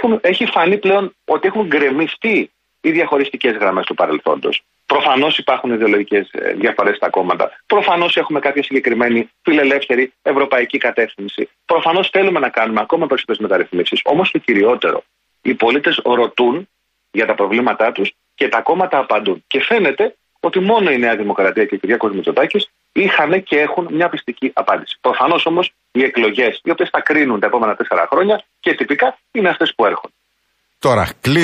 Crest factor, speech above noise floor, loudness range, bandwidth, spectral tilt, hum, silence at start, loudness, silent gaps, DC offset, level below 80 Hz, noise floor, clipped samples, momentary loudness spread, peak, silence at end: 14 dB; 50 dB; 1 LU; 14 kHz; -5.5 dB/octave; none; 0 s; -15 LUFS; none; under 0.1%; -56 dBFS; -65 dBFS; under 0.1%; 6 LU; -2 dBFS; 0 s